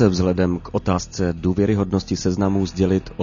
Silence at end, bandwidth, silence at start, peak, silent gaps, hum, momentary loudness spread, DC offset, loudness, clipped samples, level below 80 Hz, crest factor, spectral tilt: 0 s; 7.4 kHz; 0 s; -4 dBFS; none; none; 4 LU; under 0.1%; -21 LUFS; under 0.1%; -40 dBFS; 16 dB; -6.5 dB/octave